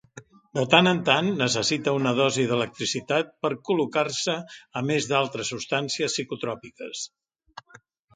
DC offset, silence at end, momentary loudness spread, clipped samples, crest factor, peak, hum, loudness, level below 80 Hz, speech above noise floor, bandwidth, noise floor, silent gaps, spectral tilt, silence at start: under 0.1%; 0.55 s; 13 LU; under 0.1%; 24 dB; -2 dBFS; none; -24 LUFS; -66 dBFS; 30 dB; 9.6 kHz; -55 dBFS; none; -4 dB/octave; 0.15 s